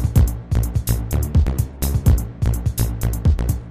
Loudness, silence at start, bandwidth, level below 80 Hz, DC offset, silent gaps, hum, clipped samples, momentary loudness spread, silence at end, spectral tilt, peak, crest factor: -20 LUFS; 0 s; 15.5 kHz; -20 dBFS; 0.2%; none; none; under 0.1%; 4 LU; 0 s; -6.5 dB/octave; -4 dBFS; 14 dB